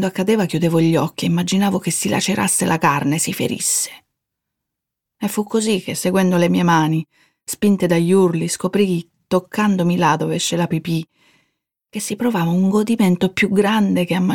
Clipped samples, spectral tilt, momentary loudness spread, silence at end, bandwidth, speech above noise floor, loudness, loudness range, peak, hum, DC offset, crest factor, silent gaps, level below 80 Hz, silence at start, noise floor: under 0.1%; -5 dB/octave; 8 LU; 0 s; 18 kHz; 64 dB; -18 LUFS; 3 LU; -2 dBFS; none; under 0.1%; 16 dB; none; -58 dBFS; 0 s; -82 dBFS